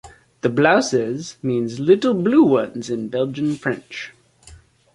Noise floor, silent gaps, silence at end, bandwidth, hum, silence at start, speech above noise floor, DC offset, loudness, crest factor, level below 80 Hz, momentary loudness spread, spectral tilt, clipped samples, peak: -47 dBFS; none; 0.4 s; 11.5 kHz; none; 0.05 s; 29 dB; under 0.1%; -19 LUFS; 18 dB; -58 dBFS; 12 LU; -6 dB/octave; under 0.1%; -2 dBFS